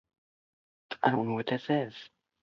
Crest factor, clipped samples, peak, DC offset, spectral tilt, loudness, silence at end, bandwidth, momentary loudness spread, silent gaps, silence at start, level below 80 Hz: 22 dB; under 0.1%; -10 dBFS; under 0.1%; -7.5 dB/octave; -31 LUFS; 0.35 s; 7 kHz; 15 LU; none; 0.9 s; -74 dBFS